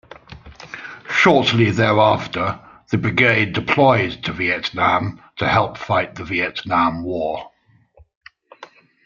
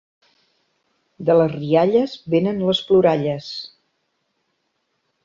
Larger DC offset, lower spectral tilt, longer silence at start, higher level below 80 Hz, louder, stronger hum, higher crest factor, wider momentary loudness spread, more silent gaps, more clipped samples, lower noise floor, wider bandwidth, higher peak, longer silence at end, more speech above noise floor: neither; second, -6 dB/octave vs -7.5 dB/octave; second, 0.3 s vs 1.2 s; first, -52 dBFS vs -60 dBFS; about the same, -18 LUFS vs -18 LUFS; neither; about the same, 20 dB vs 16 dB; about the same, 14 LU vs 13 LU; first, 8.15-8.21 s vs none; neither; second, -53 dBFS vs -71 dBFS; about the same, 7.4 kHz vs 7.4 kHz; first, 0 dBFS vs -4 dBFS; second, 0.4 s vs 1.6 s; second, 35 dB vs 54 dB